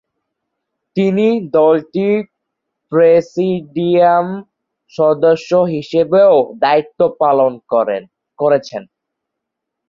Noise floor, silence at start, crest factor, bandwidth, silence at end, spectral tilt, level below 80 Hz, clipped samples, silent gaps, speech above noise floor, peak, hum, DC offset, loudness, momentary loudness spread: -78 dBFS; 0.95 s; 14 dB; 7.4 kHz; 1.05 s; -7.5 dB/octave; -60 dBFS; under 0.1%; none; 65 dB; -2 dBFS; none; under 0.1%; -14 LUFS; 11 LU